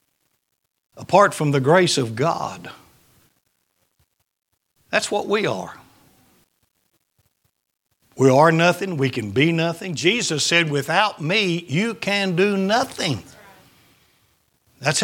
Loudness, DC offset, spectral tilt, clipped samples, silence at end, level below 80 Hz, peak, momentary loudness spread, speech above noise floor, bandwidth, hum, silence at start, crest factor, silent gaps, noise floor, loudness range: -19 LUFS; under 0.1%; -4.5 dB/octave; under 0.1%; 0 s; -64 dBFS; 0 dBFS; 10 LU; 56 dB; 17.5 kHz; none; 0.95 s; 22 dB; none; -75 dBFS; 9 LU